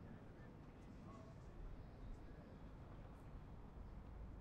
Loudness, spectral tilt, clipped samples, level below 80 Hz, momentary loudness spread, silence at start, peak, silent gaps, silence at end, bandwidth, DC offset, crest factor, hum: -59 LUFS; -8 dB/octave; under 0.1%; -60 dBFS; 2 LU; 0 s; -44 dBFS; none; 0 s; 9.4 kHz; under 0.1%; 12 dB; none